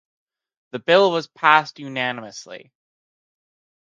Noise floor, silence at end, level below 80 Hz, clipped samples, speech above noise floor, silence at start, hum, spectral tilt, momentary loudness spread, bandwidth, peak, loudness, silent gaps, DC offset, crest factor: under -90 dBFS; 1.25 s; -76 dBFS; under 0.1%; over 70 dB; 0.75 s; none; -4 dB/octave; 20 LU; 7.6 kHz; 0 dBFS; -19 LUFS; none; under 0.1%; 22 dB